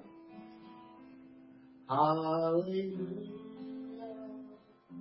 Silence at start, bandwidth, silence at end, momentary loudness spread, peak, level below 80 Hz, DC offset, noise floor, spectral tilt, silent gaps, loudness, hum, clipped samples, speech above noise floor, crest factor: 0 s; 5.6 kHz; 0 s; 25 LU; -18 dBFS; -80 dBFS; under 0.1%; -57 dBFS; -6.5 dB/octave; none; -35 LUFS; none; under 0.1%; 24 dB; 20 dB